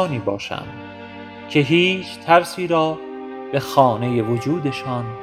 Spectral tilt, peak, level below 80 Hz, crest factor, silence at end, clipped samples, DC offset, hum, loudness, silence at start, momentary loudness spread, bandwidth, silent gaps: -6 dB/octave; 0 dBFS; -58 dBFS; 20 dB; 0 s; under 0.1%; under 0.1%; none; -19 LUFS; 0 s; 19 LU; over 20 kHz; none